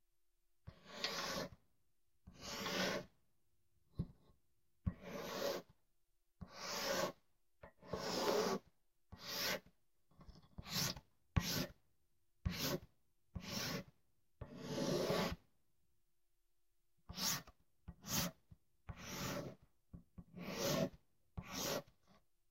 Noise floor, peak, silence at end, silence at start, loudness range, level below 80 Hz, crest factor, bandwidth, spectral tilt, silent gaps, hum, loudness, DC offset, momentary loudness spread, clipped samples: -86 dBFS; -20 dBFS; 0.7 s; 0.65 s; 4 LU; -60 dBFS; 26 dB; 16 kHz; -3.5 dB/octave; none; none; -43 LUFS; under 0.1%; 19 LU; under 0.1%